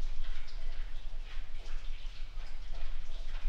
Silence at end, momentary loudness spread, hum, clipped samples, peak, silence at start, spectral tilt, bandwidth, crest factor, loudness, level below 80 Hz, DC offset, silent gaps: 0 s; 3 LU; none; under 0.1%; -20 dBFS; 0 s; -4 dB/octave; 5.8 kHz; 10 dB; -47 LUFS; -36 dBFS; under 0.1%; none